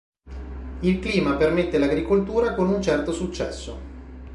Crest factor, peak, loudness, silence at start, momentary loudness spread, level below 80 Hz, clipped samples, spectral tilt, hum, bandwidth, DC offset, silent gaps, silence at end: 16 dB; -8 dBFS; -23 LUFS; 0.25 s; 18 LU; -38 dBFS; under 0.1%; -6.5 dB/octave; none; 11.5 kHz; under 0.1%; none; 0 s